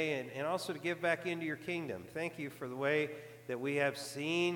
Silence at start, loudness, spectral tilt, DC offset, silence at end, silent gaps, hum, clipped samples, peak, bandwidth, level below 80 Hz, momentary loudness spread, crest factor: 0 s; -37 LUFS; -5 dB/octave; under 0.1%; 0 s; none; none; under 0.1%; -20 dBFS; 19 kHz; -80 dBFS; 9 LU; 18 dB